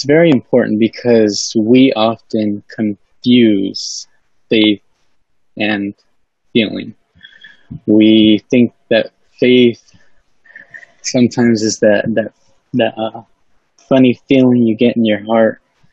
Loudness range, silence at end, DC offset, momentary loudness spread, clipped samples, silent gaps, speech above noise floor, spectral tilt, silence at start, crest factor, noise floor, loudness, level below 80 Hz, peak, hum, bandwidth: 5 LU; 0.4 s; 0.2%; 13 LU; under 0.1%; none; 51 dB; -5 dB/octave; 0 s; 14 dB; -63 dBFS; -13 LUFS; -56 dBFS; 0 dBFS; none; 8 kHz